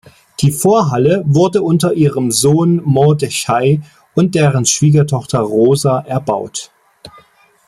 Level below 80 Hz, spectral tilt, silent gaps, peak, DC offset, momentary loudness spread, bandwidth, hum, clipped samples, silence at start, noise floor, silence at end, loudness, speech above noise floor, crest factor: -50 dBFS; -5.5 dB/octave; none; 0 dBFS; under 0.1%; 7 LU; 15.5 kHz; none; under 0.1%; 0.4 s; -48 dBFS; 0.6 s; -13 LUFS; 36 dB; 14 dB